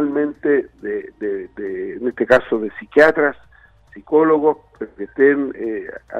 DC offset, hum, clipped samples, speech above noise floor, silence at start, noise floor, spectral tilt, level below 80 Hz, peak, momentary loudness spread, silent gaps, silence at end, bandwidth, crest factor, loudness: under 0.1%; none; under 0.1%; 30 dB; 0 s; -48 dBFS; -7 dB/octave; -52 dBFS; 0 dBFS; 14 LU; none; 0 s; 8.4 kHz; 18 dB; -18 LUFS